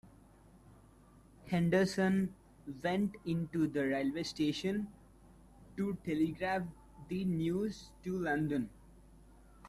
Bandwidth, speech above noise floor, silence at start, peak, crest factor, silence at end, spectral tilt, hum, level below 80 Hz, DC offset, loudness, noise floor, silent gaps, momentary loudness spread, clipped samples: 13.5 kHz; 27 dB; 0.05 s; -18 dBFS; 18 dB; 0 s; -6.5 dB/octave; none; -62 dBFS; under 0.1%; -35 LUFS; -61 dBFS; none; 15 LU; under 0.1%